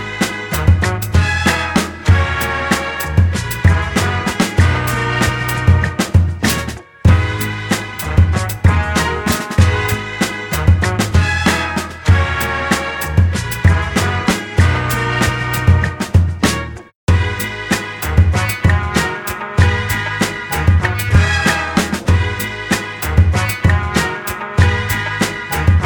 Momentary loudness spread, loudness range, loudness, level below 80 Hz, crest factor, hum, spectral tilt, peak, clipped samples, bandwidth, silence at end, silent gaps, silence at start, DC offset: 5 LU; 1 LU; -15 LUFS; -24 dBFS; 14 dB; none; -5 dB/octave; 0 dBFS; under 0.1%; 19.5 kHz; 0 s; 16.95-17.07 s; 0 s; 0.1%